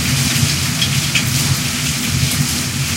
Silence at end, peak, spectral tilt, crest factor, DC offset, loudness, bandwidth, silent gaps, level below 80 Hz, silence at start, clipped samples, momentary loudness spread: 0 s; 0 dBFS; -3 dB/octave; 16 dB; under 0.1%; -15 LUFS; 16 kHz; none; -36 dBFS; 0 s; under 0.1%; 3 LU